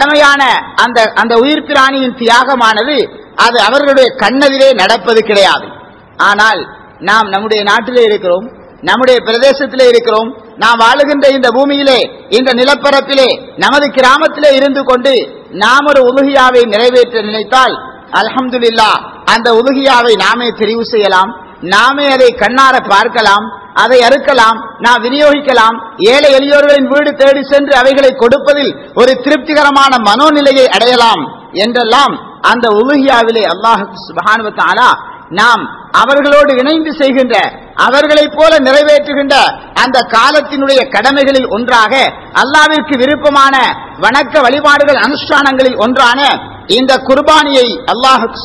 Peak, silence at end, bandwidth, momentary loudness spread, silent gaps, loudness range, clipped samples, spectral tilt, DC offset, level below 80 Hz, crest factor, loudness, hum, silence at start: 0 dBFS; 0 s; 11 kHz; 6 LU; none; 2 LU; 5%; -3 dB/octave; under 0.1%; -44 dBFS; 8 dB; -8 LUFS; none; 0 s